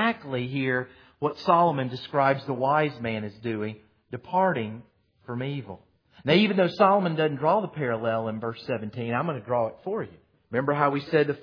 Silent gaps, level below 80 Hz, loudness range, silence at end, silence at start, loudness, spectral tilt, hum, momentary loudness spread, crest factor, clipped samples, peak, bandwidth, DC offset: none; -68 dBFS; 5 LU; 0 s; 0 s; -26 LUFS; -8 dB/octave; none; 15 LU; 20 dB; under 0.1%; -6 dBFS; 5.4 kHz; under 0.1%